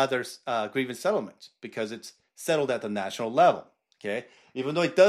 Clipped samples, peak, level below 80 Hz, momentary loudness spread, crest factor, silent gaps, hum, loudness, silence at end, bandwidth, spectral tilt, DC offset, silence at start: under 0.1%; -8 dBFS; -80 dBFS; 17 LU; 20 dB; none; none; -28 LUFS; 0 s; 14.5 kHz; -4.5 dB/octave; under 0.1%; 0 s